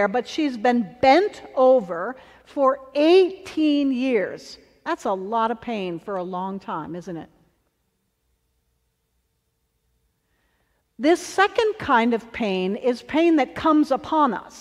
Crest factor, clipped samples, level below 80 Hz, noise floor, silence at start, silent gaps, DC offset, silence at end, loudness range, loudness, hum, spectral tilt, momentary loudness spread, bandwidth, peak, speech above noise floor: 18 dB; under 0.1%; -60 dBFS; -72 dBFS; 0 s; none; under 0.1%; 0 s; 14 LU; -21 LUFS; none; -5 dB/octave; 14 LU; 12.5 kHz; -4 dBFS; 51 dB